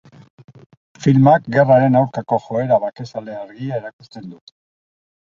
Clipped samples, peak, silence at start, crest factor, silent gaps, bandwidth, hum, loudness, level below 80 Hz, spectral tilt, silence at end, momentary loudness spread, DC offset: under 0.1%; -2 dBFS; 1 s; 16 dB; 3.93-3.99 s; 7.4 kHz; none; -16 LUFS; -58 dBFS; -8.5 dB/octave; 0.95 s; 23 LU; under 0.1%